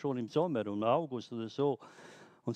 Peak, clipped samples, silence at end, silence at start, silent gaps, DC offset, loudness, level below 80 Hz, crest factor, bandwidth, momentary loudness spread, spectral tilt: -16 dBFS; under 0.1%; 0 s; 0 s; none; under 0.1%; -34 LUFS; -78 dBFS; 18 dB; 9.2 kHz; 21 LU; -7.5 dB/octave